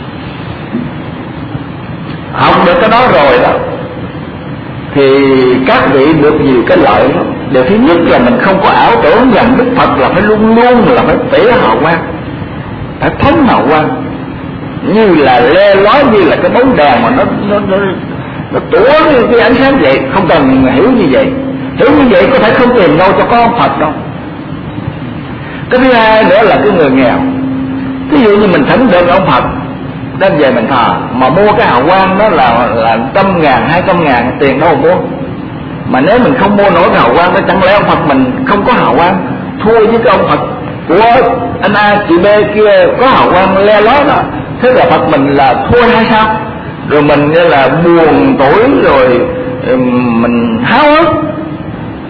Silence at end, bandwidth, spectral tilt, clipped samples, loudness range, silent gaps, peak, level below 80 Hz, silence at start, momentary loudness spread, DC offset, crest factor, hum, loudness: 0 s; 5.4 kHz; -9 dB/octave; 0.8%; 3 LU; none; 0 dBFS; -32 dBFS; 0 s; 14 LU; under 0.1%; 8 dB; none; -7 LUFS